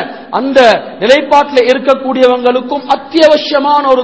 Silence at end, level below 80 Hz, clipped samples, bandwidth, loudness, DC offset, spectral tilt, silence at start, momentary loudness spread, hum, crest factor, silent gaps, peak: 0 s; -50 dBFS; 4%; 8 kHz; -9 LUFS; 0.4%; -4 dB/octave; 0 s; 7 LU; none; 10 dB; none; 0 dBFS